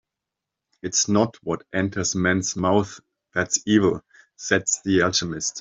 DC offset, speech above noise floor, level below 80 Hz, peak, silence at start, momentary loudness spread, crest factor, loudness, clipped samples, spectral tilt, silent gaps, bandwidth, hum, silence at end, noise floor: under 0.1%; 63 dB; -58 dBFS; -4 dBFS; 0.85 s; 10 LU; 20 dB; -22 LUFS; under 0.1%; -3.5 dB/octave; none; 8.2 kHz; none; 0 s; -85 dBFS